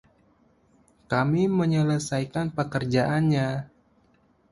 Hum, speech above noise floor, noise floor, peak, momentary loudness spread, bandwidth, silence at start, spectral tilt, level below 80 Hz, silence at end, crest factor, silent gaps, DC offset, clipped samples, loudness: none; 39 dB; -63 dBFS; -8 dBFS; 6 LU; 11.5 kHz; 1.1 s; -6.5 dB/octave; -56 dBFS; 0.85 s; 18 dB; none; under 0.1%; under 0.1%; -25 LUFS